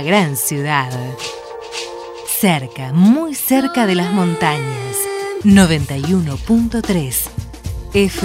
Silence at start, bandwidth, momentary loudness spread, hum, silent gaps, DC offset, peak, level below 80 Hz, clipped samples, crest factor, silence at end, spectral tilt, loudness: 0 s; 16.5 kHz; 14 LU; none; none; under 0.1%; 0 dBFS; -36 dBFS; under 0.1%; 16 dB; 0 s; -5 dB/octave; -16 LUFS